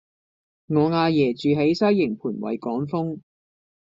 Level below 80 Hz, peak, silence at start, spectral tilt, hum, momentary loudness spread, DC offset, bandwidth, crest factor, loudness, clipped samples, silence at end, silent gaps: -64 dBFS; -8 dBFS; 0.7 s; -6 dB/octave; none; 9 LU; under 0.1%; 7.6 kHz; 16 dB; -22 LUFS; under 0.1%; 0.65 s; none